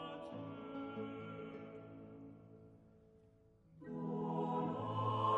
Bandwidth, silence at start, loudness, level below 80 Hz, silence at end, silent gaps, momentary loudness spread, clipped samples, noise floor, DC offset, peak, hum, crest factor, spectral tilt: 8 kHz; 0 s; -44 LUFS; -76 dBFS; 0 s; none; 20 LU; under 0.1%; -68 dBFS; under 0.1%; -24 dBFS; none; 20 dB; -8.5 dB/octave